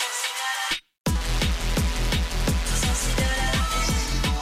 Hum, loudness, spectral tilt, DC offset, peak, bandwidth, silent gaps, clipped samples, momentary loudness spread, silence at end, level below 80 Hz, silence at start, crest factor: none; -25 LUFS; -3.5 dB/octave; under 0.1%; -12 dBFS; 16 kHz; 1.00-1.05 s; under 0.1%; 2 LU; 0 s; -26 dBFS; 0 s; 12 dB